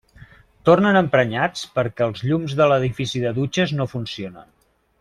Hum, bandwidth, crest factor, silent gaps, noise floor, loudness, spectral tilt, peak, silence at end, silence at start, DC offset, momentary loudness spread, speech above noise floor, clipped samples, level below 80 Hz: none; 12.5 kHz; 18 dB; none; -47 dBFS; -20 LUFS; -6 dB/octave; -2 dBFS; 0.6 s; 0.2 s; under 0.1%; 11 LU; 28 dB; under 0.1%; -52 dBFS